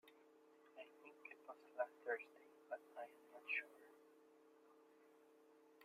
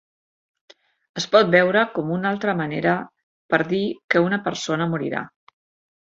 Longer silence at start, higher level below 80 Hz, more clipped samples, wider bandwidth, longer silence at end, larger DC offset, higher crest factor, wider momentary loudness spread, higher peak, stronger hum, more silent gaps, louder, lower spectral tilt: second, 0.05 s vs 1.15 s; second, under -90 dBFS vs -64 dBFS; neither; first, 15.5 kHz vs 7.8 kHz; second, 0 s vs 0.75 s; neither; about the same, 24 dB vs 20 dB; first, 21 LU vs 13 LU; second, -32 dBFS vs -2 dBFS; neither; second, none vs 3.23-3.49 s, 4.04-4.09 s; second, -51 LUFS vs -21 LUFS; second, -2.5 dB/octave vs -5.5 dB/octave